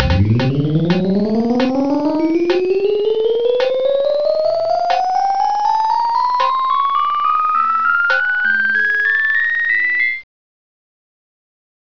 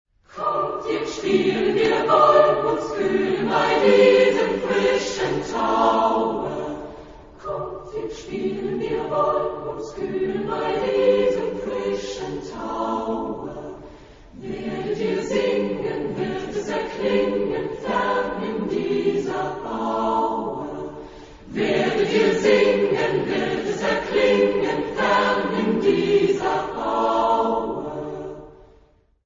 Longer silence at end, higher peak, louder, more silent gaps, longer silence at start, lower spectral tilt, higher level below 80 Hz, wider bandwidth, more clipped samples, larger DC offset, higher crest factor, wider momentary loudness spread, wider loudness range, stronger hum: first, 1.75 s vs 0.75 s; about the same, 0 dBFS vs -2 dBFS; first, -15 LUFS vs -22 LUFS; neither; second, 0 s vs 0.3 s; first, -7 dB/octave vs -5.5 dB/octave; first, -38 dBFS vs -50 dBFS; second, 5.4 kHz vs 7.6 kHz; neither; first, 1% vs under 0.1%; about the same, 16 dB vs 18 dB; second, 3 LU vs 14 LU; second, 2 LU vs 8 LU; neither